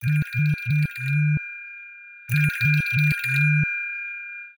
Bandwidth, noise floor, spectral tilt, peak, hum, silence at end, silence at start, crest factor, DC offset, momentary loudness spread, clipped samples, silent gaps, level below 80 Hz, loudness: over 20 kHz; -43 dBFS; -6 dB/octave; -10 dBFS; none; 0.05 s; 0 s; 14 dB; under 0.1%; 16 LU; under 0.1%; none; -52 dBFS; -22 LUFS